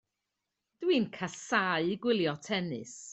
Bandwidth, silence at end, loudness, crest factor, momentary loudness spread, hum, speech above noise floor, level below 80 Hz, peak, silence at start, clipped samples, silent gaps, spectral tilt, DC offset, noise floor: 8.4 kHz; 0 s; -31 LUFS; 20 dB; 9 LU; none; 55 dB; -74 dBFS; -12 dBFS; 0.8 s; under 0.1%; none; -4.5 dB/octave; under 0.1%; -86 dBFS